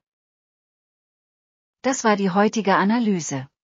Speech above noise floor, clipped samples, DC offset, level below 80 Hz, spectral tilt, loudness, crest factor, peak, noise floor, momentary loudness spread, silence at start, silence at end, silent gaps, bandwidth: over 70 dB; under 0.1%; under 0.1%; -74 dBFS; -5 dB/octave; -21 LUFS; 18 dB; -6 dBFS; under -90 dBFS; 8 LU; 1.85 s; 0.2 s; none; 7.6 kHz